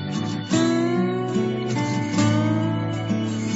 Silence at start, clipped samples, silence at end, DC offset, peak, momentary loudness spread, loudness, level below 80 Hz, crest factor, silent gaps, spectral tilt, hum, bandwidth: 0 s; under 0.1%; 0 s; under 0.1%; -10 dBFS; 5 LU; -23 LUFS; -56 dBFS; 14 dB; none; -6 dB/octave; none; 8 kHz